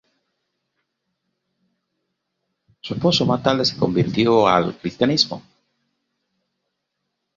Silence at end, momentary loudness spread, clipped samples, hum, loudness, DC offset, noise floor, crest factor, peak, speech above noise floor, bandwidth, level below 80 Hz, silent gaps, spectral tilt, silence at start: 1.95 s; 11 LU; under 0.1%; none; -19 LUFS; under 0.1%; -77 dBFS; 22 dB; -2 dBFS; 59 dB; 7.4 kHz; -56 dBFS; none; -5.5 dB/octave; 2.85 s